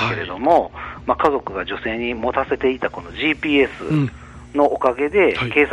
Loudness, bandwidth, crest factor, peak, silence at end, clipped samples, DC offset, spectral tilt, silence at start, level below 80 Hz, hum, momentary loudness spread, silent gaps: -20 LUFS; 10.5 kHz; 16 dB; -2 dBFS; 0 s; under 0.1%; under 0.1%; -7 dB/octave; 0 s; -42 dBFS; none; 10 LU; none